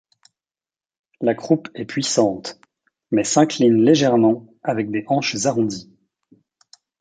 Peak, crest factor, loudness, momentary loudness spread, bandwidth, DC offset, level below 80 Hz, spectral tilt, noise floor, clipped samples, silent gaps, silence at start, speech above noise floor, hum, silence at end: -2 dBFS; 18 dB; -19 LUFS; 11 LU; 9.4 kHz; under 0.1%; -62 dBFS; -5 dB/octave; under -90 dBFS; under 0.1%; none; 1.2 s; over 72 dB; none; 1.15 s